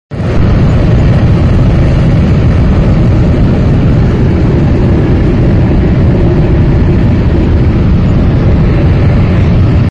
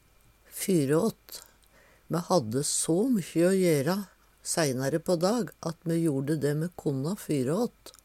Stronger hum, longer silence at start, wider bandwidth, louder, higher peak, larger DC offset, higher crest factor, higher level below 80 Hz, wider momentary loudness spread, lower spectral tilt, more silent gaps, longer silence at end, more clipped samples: neither; second, 0.1 s vs 0.5 s; second, 7.4 kHz vs 16.5 kHz; first, -8 LUFS vs -28 LUFS; first, 0 dBFS vs -12 dBFS; neither; second, 6 dB vs 16 dB; first, -12 dBFS vs -64 dBFS; second, 1 LU vs 10 LU; first, -9.5 dB/octave vs -5.5 dB/octave; neither; second, 0 s vs 0.15 s; neither